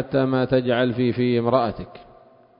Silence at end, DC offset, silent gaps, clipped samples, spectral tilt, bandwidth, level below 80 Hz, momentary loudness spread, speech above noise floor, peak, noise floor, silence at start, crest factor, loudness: 0.55 s; under 0.1%; none; under 0.1%; -12 dB/octave; 5.4 kHz; -52 dBFS; 10 LU; 30 dB; -4 dBFS; -51 dBFS; 0 s; 18 dB; -21 LUFS